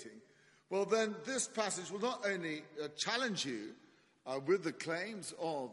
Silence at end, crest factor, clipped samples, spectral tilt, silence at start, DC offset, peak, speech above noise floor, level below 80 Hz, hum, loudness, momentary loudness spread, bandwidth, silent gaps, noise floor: 0 s; 20 dB; under 0.1%; -3 dB/octave; 0 s; under 0.1%; -20 dBFS; 29 dB; -86 dBFS; none; -38 LUFS; 9 LU; 11.5 kHz; none; -67 dBFS